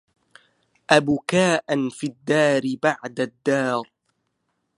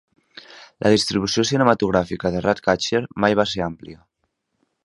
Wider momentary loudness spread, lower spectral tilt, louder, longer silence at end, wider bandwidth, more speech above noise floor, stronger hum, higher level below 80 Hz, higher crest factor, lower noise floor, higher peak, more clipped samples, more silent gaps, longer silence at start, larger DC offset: about the same, 9 LU vs 8 LU; about the same, -5 dB/octave vs -4.5 dB/octave; about the same, -22 LUFS vs -20 LUFS; about the same, 0.95 s vs 0.9 s; about the same, 11.5 kHz vs 11.5 kHz; about the same, 53 dB vs 54 dB; neither; second, -64 dBFS vs -48 dBFS; about the same, 22 dB vs 20 dB; about the same, -74 dBFS vs -74 dBFS; about the same, 0 dBFS vs 0 dBFS; neither; neither; first, 0.9 s vs 0.5 s; neither